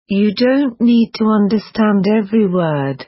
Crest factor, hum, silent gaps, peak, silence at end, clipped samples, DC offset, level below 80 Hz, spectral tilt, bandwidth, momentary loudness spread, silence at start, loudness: 10 dB; none; none; -4 dBFS; 0.05 s; under 0.1%; under 0.1%; -54 dBFS; -11 dB/octave; 5.8 kHz; 3 LU; 0.1 s; -14 LUFS